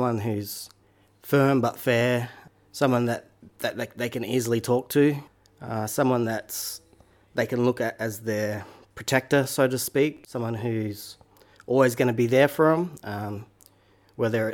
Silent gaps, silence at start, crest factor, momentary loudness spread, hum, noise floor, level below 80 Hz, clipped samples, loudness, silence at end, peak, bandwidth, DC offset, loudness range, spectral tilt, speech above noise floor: none; 0 s; 18 dB; 14 LU; none; -60 dBFS; -64 dBFS; under 0.1%; -25 LUFS; 0 s; -6 dBFS; 19 kHz; under 0.1%; 3 LU; -5.5 dB/octave; 36 dB